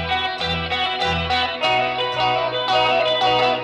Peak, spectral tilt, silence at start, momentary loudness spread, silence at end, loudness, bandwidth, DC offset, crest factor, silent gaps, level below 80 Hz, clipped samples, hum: -8 dBFS; -4 dB/octave; 0 s; 4 LU; 0 s; -19 LUFS; 10.5 kHz; under 0.1%; 12 dB; none; -44 dBFS; under 0.1%; none